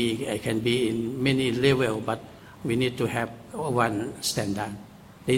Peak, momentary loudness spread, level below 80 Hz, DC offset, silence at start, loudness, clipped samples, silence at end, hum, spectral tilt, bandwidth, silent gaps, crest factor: -8 dBFS; 12 LU; -56 dBFS; under 0.1%; 0 s; -27 LUFS; under 0.1%; 0 s; none; -5 dB/octave; 16.5 kHz; none; 18 dB